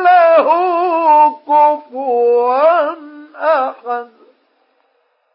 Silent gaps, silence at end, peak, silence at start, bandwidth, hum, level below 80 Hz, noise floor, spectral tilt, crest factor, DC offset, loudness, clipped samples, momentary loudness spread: none; 1.3 s; -2 dBFS; 0 s; 5.6 kHz; none; -84 dBFS; -61 dBFS; -7.5 dB/octave; 12 dB; under 0.1%; -13 LUFS; under 0.1%; 12 LU